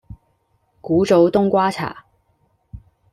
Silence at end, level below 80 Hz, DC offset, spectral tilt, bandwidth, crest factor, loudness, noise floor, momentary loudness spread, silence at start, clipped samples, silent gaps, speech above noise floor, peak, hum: 0.35 s; -50 dBFS; under 0.1%; -7 dB/octave; 12.5 kHz; 18 dB; -17 LUFS; -65 dBFS; 15 LU; 0.1 s; under 0.1%; none; 48 dB; -2 dBFS; none